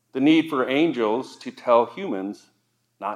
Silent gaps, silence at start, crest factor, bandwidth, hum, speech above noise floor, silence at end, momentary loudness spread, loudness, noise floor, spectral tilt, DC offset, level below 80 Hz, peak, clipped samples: none; 0.15 s; 18 dB; 10.5 kHz; none; 26 dB; 0 s; 15 LU; -22 LUFS; -48 dBFS; -6 dB/octave; under 0.1%; -88 dBFS; -4 dBFS; under 0.1%